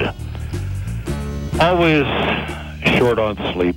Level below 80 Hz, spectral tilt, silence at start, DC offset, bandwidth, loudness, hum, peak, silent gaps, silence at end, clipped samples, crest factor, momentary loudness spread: -32 dBFS; -6 dB/octave; 0 s; under 0.1%; 17 kHz; -19 LUFS; none; -4 dBFS; none; 0 s; under 0.1%; 14 dB; 12 LU